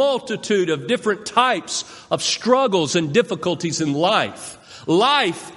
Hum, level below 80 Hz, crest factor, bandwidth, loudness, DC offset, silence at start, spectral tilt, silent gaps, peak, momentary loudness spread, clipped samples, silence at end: none; -64 dBFS; 18 dB; 11.5 kHz; -19 LUFS; under 0.1%; 0 s; -3.5 dB/octave; none; -2 dBFS; 9 LU; under 0.1%; 0 s